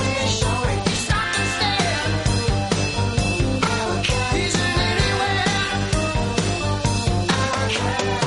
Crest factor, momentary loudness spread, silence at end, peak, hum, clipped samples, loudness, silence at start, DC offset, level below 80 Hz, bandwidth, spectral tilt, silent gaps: 14 dB; 2 LU; 0 s; -6 dBFS; 50 Hz at -35 dBFS; under 0.1%; -21 LUFS; 0 s; under 0.1%; -32 dBFS; 11.5 kHz; -4 dB/octave; none